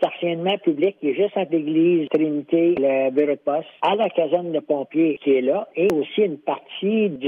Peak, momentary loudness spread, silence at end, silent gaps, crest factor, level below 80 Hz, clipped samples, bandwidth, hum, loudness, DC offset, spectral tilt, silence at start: -8 dBFS; 5 LU; 0 s; none; 12 dB; -68 dBFS; under 0.1%; 7.2 kHz; none; -21 LUFS; under 0.1%; -7.5 dB/octave; 0 s